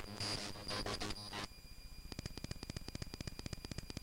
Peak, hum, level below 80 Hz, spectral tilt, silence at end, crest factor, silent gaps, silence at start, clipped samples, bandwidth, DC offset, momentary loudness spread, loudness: -30 dBFS; none; -54 dBFS; -3.5 dB/octave; 0 s; 14 dB; none; 0 s; under 0.1%; 17 kHz; under 0.1%; 10 LU; -45 LUFS